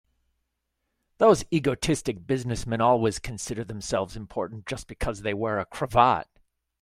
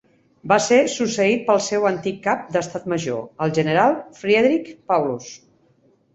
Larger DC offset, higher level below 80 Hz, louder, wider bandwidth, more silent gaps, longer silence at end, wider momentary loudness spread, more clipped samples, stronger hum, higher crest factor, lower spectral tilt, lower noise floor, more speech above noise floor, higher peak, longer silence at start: neither; first, -46 dBFS vs -62 dBFS; second, -26 LUFS vs -20 LUFS; first, 15.5 kHz vs 8.2 kHz; neither; second, 0.6 s vs 0.8 s; first, 12 LU vs 9 LU; neither; neither; about the same, 22 dB vs 18 dB; about the same, -5.5 dB/octave vs -4.5 dB/octave; first, -79 dBFS vs -59 dBFS; first, 54 dB vs 39 dB; about the same, -4 dBFS vs -2 dBFS; first, 1.2 s vs 0.45 s